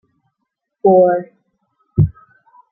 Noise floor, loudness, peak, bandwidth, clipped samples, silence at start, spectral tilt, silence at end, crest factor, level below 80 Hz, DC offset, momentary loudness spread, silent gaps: -75 dBFS; -15 LUFS; -2 dBFS; 2.2 kHz; under 0.1%; 0.85 s; -15 dB/octave; 0.6 s; 16 dB; -40 dBFS; under 0.1%; 11 LU; none